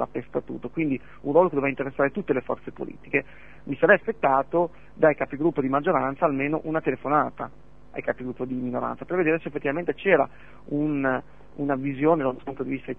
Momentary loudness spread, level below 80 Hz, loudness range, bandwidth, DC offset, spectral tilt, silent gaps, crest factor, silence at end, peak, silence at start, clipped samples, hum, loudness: 11 LU; -56 dBFS; 4 LU; 3.8 kHz; 0.6%; -9.5 dB/octave; none; 22 dB; 0.05 s; -4 dBFS; 0 s; under 0.1%; none; -25 LUFS